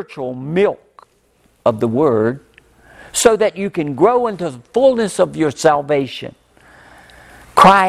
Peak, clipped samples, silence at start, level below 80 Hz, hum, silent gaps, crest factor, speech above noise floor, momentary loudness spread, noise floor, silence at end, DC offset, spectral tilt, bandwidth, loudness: 0 dBFS; under 0.1%; 0 s; -50 dBFS; none; none; 16 dB; 42 dB; 13 LU; -57 dBFS; 0 s; under 0.1%; -4.5 dB/octave; 15 kHz; -16 LUFS